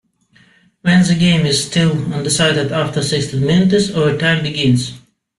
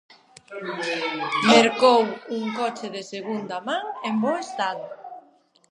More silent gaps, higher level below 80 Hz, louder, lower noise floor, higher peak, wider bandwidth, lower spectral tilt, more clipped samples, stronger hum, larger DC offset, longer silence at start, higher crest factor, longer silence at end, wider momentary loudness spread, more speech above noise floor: neither; first, -46 dBFS vs -80 dBFS; first, -15 LUFS vs -23 LUFS; second, -52 dBFS vs -58 dBFS; about the same, -2 dBFS vs -2 dBFS; about the same, 12.5 kHz vs 11.5 kHz; about the same, -5 dB/octave vs -4 dB/octave; neither; neither; neither; first, 0.85 s vs 0.5 s; second, 14 dB vs 22 dB; about the same, 0.4 s vs 0.5 s; second, 5 LU vs 18 LU; about the same, 38 dB vs 35 dB